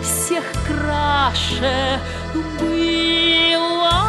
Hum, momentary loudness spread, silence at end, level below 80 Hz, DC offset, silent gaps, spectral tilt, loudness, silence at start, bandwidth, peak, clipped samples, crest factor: none; 10 LU; 0 s; -32 dBFS; under 0.1%; none; -3.5 dB/octave; -18 LUFS; 0 s; 14 kHz; -4 dBFS; under 0.1%; 14 dB